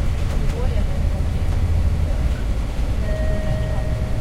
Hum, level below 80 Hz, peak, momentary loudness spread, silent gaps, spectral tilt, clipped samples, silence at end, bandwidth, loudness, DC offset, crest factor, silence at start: none; -22 dBFS; -6 dBFS; 4 LU; none; -7 dB/octave; under 0.1%; 0 s; 13 kHz; -23 LUFS; under 0.1%; 12 dB; 0 s